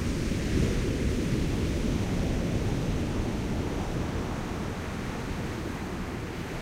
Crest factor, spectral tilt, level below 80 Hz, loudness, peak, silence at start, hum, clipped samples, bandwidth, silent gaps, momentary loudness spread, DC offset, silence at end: 16 dB; -6 dB/octave; -36 dBFS; -31 LUFS; -14 dBFS; 0 s; none; under 0.1%; 16 kHz; none; 6 LU; under 0.1%; 0 s